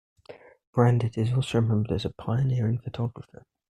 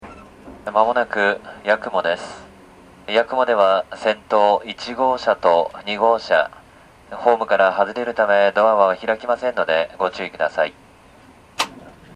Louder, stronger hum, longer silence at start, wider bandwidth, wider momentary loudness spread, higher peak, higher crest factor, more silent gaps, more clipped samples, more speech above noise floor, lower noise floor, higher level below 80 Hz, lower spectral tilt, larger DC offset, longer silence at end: second, -26 LUFS vs -19 LUFS; neither; first, 0.3 s vs 0.05 s; second, 9.6 kHz vs 12.5 kHz; about the same, 10 LU vs 10 LU; second, -6 dBFS vs 0 dBFS; about the same, 20 dB vs 20 dB; first, 0.67-0.73 s vs none; neither; second, 24 dB vs 29 dB; about the same, -49 dBFS vs -47 dBFS; about the same, -54 dBFS vs -56 dBFS; first, -8 dB/octave vs -3.5 dB/octave; neither; first, 0.55 s vs 0.25 s